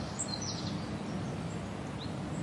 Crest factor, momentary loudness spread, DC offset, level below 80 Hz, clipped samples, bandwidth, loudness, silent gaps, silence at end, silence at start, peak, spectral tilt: 14 dB; 4 LU; under 0.1%; -54 dBFS; under 0.1%; 11.5 kHz; -38 LUFS; none; 0 s; 0 s; -22 dBFS; -4.5 dB/octave